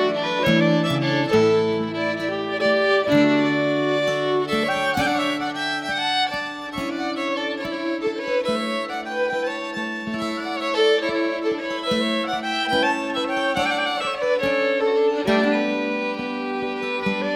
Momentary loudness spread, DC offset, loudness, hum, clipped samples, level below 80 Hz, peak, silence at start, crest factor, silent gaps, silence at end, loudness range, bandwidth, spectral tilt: 8 LU; under 0.1%; -22 LUFS; none; under 0.1%; -56 dBFS; -6 dBFS; 0 s; 16 dB; none; 0 s; 5 LU; 16 kHz; -5 dB/octave